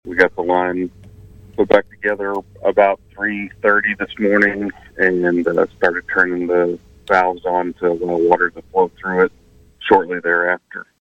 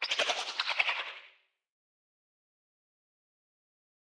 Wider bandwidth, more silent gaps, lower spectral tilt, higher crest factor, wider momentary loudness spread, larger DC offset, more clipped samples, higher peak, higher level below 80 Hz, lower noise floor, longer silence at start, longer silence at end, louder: second, 8.2 kHz vs 11 kHz; neither; first, -7 dB/octave vs 2 dB/octave; second, 18 dB vs 26 dB; second, 7 LU vs 12 LU; neither; neither; first, 0 dBFS vs -12 dBFS; first, -50 dBFS vs under -90 dBFS; second, -41 dBFS vs -62 dBFS; about the same, 0.05 s vs 0 s; second, 0.25 s vs 2.75 s; first, -17 LUFS vs -31 LUFS